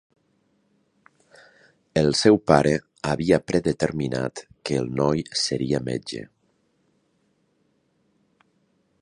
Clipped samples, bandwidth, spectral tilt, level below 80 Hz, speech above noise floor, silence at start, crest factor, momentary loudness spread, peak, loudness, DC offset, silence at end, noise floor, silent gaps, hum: under 0.1%; 11 kHz; -5.5 dB/octave; -52 dBFS; 46 dB; 1.95 s; 24 dB; 12 LU; 0 dBFS; -23 LUFS; under 0.1%; 2.75 s; -68 dBFS; none; none